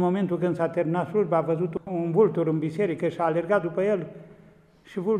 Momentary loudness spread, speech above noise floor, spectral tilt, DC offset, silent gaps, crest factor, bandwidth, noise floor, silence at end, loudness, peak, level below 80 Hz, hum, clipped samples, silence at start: 7 LU; 30 dB; -9 dB/octave; under 0.1%; none; 16 dB; 10 kHz; -54 dBFS; 0 s; -25 LUFS; -10 dBFS; -66 dBFS; none; under 0.1%; 0 s